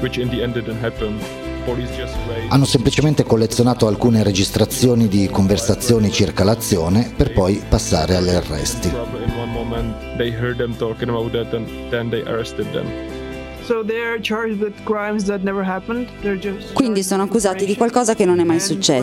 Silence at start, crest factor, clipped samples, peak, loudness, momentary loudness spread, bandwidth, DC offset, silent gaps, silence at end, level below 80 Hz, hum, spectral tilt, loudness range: 0 s; 18 dB; under 0.1%; 0 dBFS; -19 LUFS; 10 LU; 16.5 kHz; under 0.1%; none; 0 s; -34 dBFS; none; -5.5 dB/octave; 7 LU